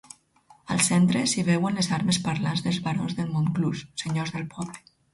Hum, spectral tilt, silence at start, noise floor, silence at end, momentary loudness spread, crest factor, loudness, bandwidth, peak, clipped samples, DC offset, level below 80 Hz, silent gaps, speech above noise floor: none; -4.5 dB/octave; 0.7 s; -58 dBFS; 0.35 s; 12 LU; 18 dB; -25 LUFS; 11.5 kHz; -8 dBFS; under 0.1%; under 0.1%; -58 dBFS; none; 33 dB